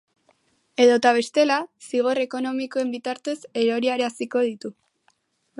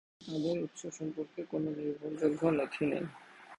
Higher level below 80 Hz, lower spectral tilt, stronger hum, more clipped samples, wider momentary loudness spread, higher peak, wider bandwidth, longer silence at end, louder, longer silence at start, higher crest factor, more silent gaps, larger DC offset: second, -78 dBFS vs -72 dBFS; second, -3.5 dB/octave vs -6.5 dB/octave; neither; neither; about the same, 11 LU vs 10 LU; first, -4 dBFS vs -14 dBFS; about the same, 11.5 kHz vs 11 kHz; first, 0.9 s vs 0.05 s; first, -22 LUFS vs -35 LUFS; first, 0.8 s vs 0.2 s; about the same, 20 dB vs 20 dB; neither; neither